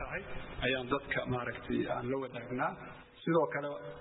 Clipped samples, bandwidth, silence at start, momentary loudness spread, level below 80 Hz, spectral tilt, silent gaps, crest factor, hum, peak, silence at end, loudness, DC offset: under 0.1%; 3.9 kHz; 0 s; 10 LU; -54 dBFS; -2.5 dB/octave; none; 20 dB; none; -16 dBFS; 0 s; -36 LUFS; under 0.1%